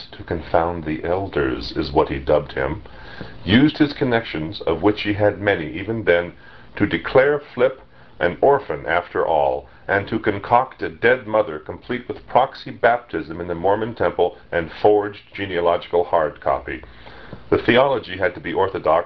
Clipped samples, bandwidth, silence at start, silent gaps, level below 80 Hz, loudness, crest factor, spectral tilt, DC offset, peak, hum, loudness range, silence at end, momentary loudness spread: under 0.1%; 6 kHz; 0 s; none; -42 dBFS; -20 LUFS; 20 dB; -8.5 dB/octave; 0.4%; -2 dBFS; none; 2 LU; 0 s; 12 LU